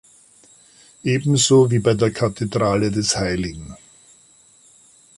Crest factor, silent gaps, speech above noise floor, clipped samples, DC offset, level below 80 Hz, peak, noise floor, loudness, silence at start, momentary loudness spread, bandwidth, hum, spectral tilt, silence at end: 18 dB; none; 34 dB; under 0.1%; under 0.1%; -46 dBFS; -4 dBFS; -52 dBFS; -19 LUFS; 1.05 s; 14 LU; 11.5 kHz; none; -5 dB/octave; 1.45 s